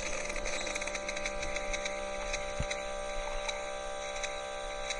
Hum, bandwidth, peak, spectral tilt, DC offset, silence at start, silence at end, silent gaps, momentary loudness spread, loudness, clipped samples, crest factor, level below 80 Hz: none; 11.5 kHz; -20 dBFS; -2 dB/octave; under 0.1%; 0 s; 0 s; none; 4 LU; -36 LUFS; under 0.1%; 16 dB; -44 dBFS